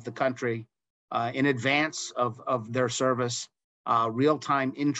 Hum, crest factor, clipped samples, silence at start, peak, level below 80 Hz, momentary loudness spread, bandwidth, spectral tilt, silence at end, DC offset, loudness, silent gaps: none; 16 dB; under 0.1%; 0 s; -12 dBFS; -74 dBFS; 9 LU; 8.8 kHz; -4.5 dB/octave; 0 s; under 0.1%; -27 LUFS; 0.90-1.08 s, 3.64-3.84 s